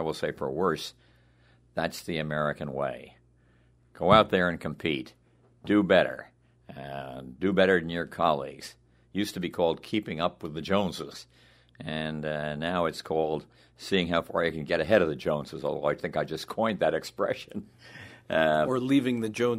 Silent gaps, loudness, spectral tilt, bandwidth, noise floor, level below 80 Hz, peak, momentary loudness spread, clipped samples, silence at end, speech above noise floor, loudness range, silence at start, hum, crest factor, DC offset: none; -28 LUFS; -6 dB/octave; 16 kHz; -62 dBFS; -58 dBFS; -4 dBFS; 18 LU; under 0.1%; 0 s; 34 dB; 6 LU; 0 s; none; 24 dB; under 0.1%